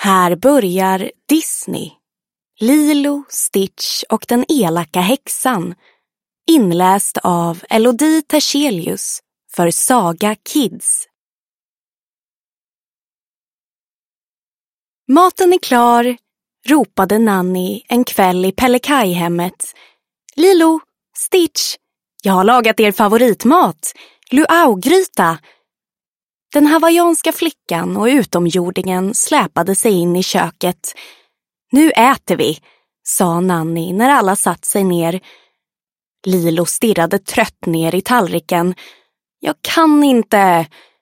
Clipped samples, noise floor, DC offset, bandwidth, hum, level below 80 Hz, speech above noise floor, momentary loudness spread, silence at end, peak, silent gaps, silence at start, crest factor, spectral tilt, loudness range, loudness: under 0.1%; under -90 dBFS; under 0.1%; 16.5 kHz; none; -56 dBFS; over 77 dB; 10 LU; 0.35 s; 0 dBFS; 11.15-15.04 s, 26.08-26.13 s, 26.23-26.39 s, 36.06-36.12 s; 0 s; 14 dB; -4 dB/octave; 4 LU; -14 LUFS